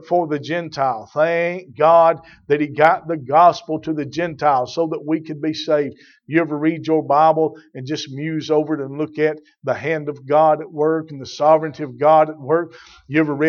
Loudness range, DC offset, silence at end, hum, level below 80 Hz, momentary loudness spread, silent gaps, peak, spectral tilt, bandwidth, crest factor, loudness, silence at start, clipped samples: 4 LU; under 0.1%; 0 s; none; -64 dBFS; 11 LU; none; 0 dBFS; -6.5 dB/octave; 7 kHz; 18 dB; -19 LUFS; 0.05 s; under 0.1%